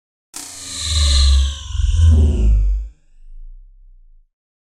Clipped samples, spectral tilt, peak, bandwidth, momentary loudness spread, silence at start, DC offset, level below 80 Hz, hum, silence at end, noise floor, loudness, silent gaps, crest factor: under 0.1%; -4 dB/octave; -4 dBFS; 12 kHz; 18 LU; 0.35 s; under 0.1%; -18 dBFS; none; 1.25 s; -45 dBFS; -17 LUFS; none; 14 dB